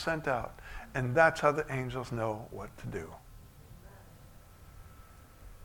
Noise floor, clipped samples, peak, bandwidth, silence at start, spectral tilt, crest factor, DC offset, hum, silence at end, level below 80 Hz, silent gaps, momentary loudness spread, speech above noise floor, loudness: -54 dBFS; under 0.1%; -10 dBFS; 19 kHz; 0 s; -6 dB/octave; 24 dB; under 0.1%; none; 0 s; -54 dBFS; none; 28 LU; 22 dB; -32 LUFS